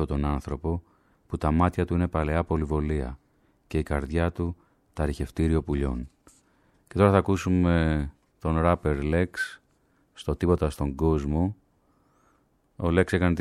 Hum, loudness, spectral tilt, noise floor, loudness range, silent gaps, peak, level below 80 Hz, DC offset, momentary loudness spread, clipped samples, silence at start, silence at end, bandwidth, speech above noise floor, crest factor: none; -27 LUFS; -8 dB/octave; -66 dBFS; 5 LU; none; -6 dBFS; -36 dBFS; under 0.1%; 12 LU; under 0.1%; 0 s; 0 s; 12.5 kHz; 41 dB; 22 dB